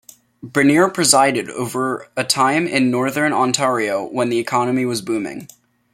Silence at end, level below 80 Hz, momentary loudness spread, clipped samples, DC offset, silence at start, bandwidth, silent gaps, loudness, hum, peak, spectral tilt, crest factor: 0.45 s; -62 dBFS; 10 LU; under 0.1%; under 0.1%; 0.45 s; 16.5 kHz; none; -17 LUFS; none; 0 dBFS; -3.5 dB/octave; 18 dB